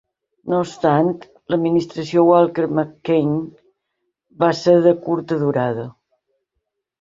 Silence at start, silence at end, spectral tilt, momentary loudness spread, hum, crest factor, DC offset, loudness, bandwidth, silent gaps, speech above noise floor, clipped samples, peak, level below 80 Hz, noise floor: 0.45 s; 1.1 s; -7.5 dB/octave; 11 LU; none; 18 dB; under 0.1%; -18 LUFS; 7.8 kHz; none; 59 dB; under 0.1%; -2 dBFS; -60 dBFS; -77 dBFS